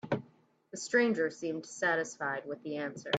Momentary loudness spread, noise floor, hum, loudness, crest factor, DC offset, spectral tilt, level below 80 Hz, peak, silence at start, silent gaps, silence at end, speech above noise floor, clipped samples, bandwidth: 11 LU; -65 dBFS; none; -33 LUFS; 18 dB; under 0.1%; -4 dB/octave; -80 dBFS; -16 dBFS; 0.05 s; none; 0 s; 32 dB; under 0.1%; 9.2 kHz